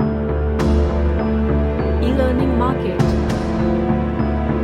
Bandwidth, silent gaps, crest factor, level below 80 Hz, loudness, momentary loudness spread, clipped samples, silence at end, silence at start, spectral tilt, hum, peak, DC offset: 9.4 kHz; none; 12 dB; -22 dBFS; -18 LUFS; 3 LU; under 0.1%; 0 s; 0 s; -8.5 dB/octave; none; -4 dBFS; under 0.1%